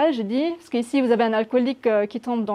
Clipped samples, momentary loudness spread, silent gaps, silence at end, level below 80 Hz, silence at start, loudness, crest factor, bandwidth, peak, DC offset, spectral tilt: under 0.1%; 6 LU; none; 0 s; -72 dBFS; 0 s; -22 LUFS; 14 dB; 11.5 kHz; -8 dBFS; under 0.1%; -6 dB/octave